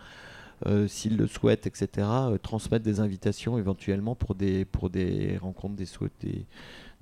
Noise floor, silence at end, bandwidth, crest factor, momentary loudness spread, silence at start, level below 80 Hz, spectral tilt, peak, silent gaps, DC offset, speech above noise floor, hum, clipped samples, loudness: -48 dBFS; 0.1 s; 13.5 kHz; 18 dB; 11 LU; 0 s; -46 dBFS; -7 dB/octave; -12 dBFS; none; under 0.1%; 20 dB; none; under 0.1%; -29 LUFS